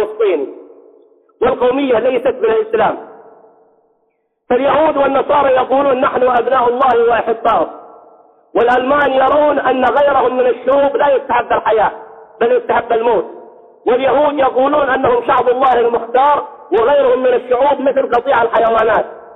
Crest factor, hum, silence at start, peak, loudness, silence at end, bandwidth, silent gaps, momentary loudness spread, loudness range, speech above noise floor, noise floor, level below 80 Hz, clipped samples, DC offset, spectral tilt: 10 dB; none; 0 s; -2 dBFS; -13 LUFS; 0 s; 4.1 kHz; none; 5 LU; 4 LU; 51 dB; -64 dBFS; -48 dBFS; under 0.1%; under 0.1%; -7 dB/octave